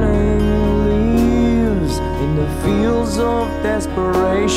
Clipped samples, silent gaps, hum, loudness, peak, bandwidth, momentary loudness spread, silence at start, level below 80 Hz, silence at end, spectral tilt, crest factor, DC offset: under 0.1%; none; none; -17 LUFS; -4 dBFS; 15 kHz; 4 LU; 0 s; -24 dBFS; 0 s; -6.5 dB/octave; 10 dB; under 0.1%